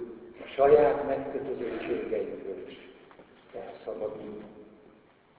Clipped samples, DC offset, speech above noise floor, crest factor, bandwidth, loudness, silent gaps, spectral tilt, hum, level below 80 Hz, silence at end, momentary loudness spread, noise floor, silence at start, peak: under 0.1%; under 0.1%; 31 dB; 22 dB; 4 kHz; -28 LUFS; none; -9.5 dB/octave; none; -60 dBFS; 0.75 s; 23 LU; -59 dBFS; 0 s; -8 dBFS